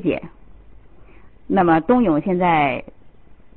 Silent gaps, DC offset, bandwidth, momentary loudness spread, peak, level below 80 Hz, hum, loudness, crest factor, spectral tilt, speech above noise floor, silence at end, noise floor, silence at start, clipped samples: none; 0.6%; 4.3 kHz; 10 LU; -6 dBFS; -48 dBFS; none; -18 LUFS; 16 dB; -12 dB/octave; 30 dB; 0.7 s; -48 dBFS; 0 s; under 0.1%